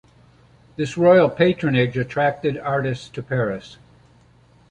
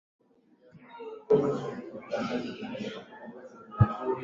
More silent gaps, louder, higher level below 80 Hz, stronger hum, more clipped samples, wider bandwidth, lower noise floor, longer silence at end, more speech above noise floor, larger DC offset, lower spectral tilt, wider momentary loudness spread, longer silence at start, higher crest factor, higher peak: neither; first, -20 LUFS vs -30 LUFS; about the same, -54 dBFS vs -50 dBFS; neither; neither; first, 9.2 kHz vs 7.6 kHz; second, -53 dBFS vs -62 dBFS; first, 0.95 s vs 0 s; about the same, 34 dB vs 31 dB; neither; about the same, -7 dB/octave vs -8 dB/octave; second, 14 LU vs 20 LU; about the same, 0.8 s vs 0.75 s; second, 18 dB vs 24 dB; first, -2 dBFS vs -8 dBFS